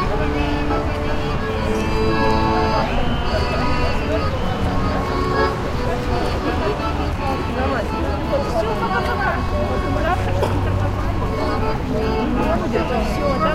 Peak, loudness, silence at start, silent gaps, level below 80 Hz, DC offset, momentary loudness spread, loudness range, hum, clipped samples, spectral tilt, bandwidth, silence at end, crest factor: -4 dBFS; -21 LUFS; 0 s; none; -26 dBFS; under 0.1%; 4 LU; 1 LU; none; under 0.1%; -6.5 dB/octave; 15.5 kHz; 0 s; 14 dB